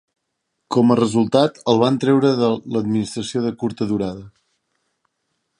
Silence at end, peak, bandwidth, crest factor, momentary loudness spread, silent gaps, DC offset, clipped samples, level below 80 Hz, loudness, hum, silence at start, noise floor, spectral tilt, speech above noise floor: 1.3 s; -2 dBFS; 11 kHz; 18 dB; 8 LU; none; under 0.1%; under 0.1%; -56 dBFS; -19 LUFS; none; 0.7 s; -75 dBFS; -6.5 dB/octave; 57 dB